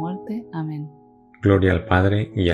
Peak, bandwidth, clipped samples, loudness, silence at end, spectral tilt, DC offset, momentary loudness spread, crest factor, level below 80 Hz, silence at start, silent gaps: -4 dBFS; 4.6 kHz; under 0.1%; -21 LUFS; 0 s; -8.5 dB/octave; under 0.1%; 13 LU; 18 dB; -42 dBFS; 0 s; none